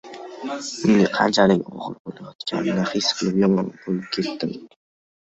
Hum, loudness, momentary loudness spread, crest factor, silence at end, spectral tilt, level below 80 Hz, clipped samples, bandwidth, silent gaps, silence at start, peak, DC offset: none; -21 LUFS; 16 LU; 20 dB; 0.65 s; -5 dB/octave; -58 dBFS; under 0.1%; 8.2 kHz; 2.00-2.05 s, 2.35-2.39 s; 0.05 s; -2 dBFS; under 0.1%